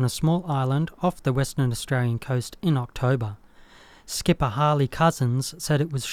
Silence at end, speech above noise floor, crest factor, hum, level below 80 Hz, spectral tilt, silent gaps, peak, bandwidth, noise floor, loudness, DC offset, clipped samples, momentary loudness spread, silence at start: 0 s; 26 dB; 16 dB; none; -46 dBFS; -6 dB/octave; none; -8 dBFS; 16 kHz; -50 dBFS; -24 LUFS; under 0.1%; under 0.1%; 5 LU; 0 s